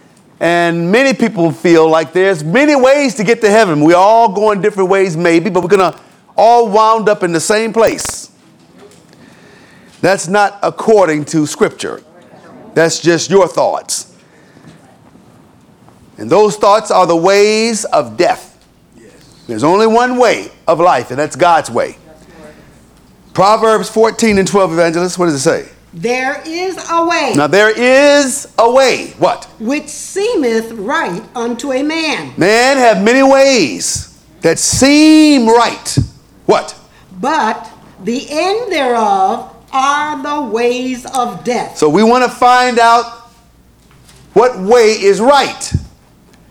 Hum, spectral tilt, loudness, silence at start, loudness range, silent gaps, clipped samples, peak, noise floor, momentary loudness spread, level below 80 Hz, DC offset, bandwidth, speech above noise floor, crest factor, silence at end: none; -4 dB/octave; -11 LUFS; 0.4 s; 6 LU; none; 0.3%; 0 dBFS; -46 dBFS; 11 LU; -44 dBFS; under 0.1%; 19 kHz; 35 dB; 12 dB; 0.65 s